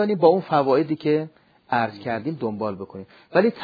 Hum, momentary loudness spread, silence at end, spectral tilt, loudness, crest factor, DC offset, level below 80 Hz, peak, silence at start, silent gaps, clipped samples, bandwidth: none; 17 LU; 0 s; -9 dB/octave; -22 LUFS; 20 dB; under 0.1%; -68 dBFS; -2 dBFS; 0 s; none; under 0.1%; 5 kHz